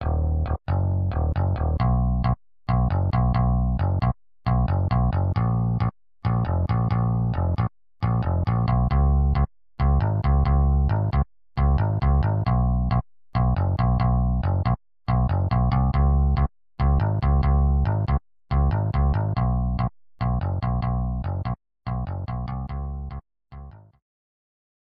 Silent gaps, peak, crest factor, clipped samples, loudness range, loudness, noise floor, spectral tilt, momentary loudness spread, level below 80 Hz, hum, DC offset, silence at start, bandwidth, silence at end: none; -10 dBFS; 12 dB; under 0.1%; 6 LU; -24 LUFS; -43 dBFS; -11.5 dB/octave; 9 LU; -26 dBFS; none; under 0.1%; 0 s; 5.2 kHz; 1.2 s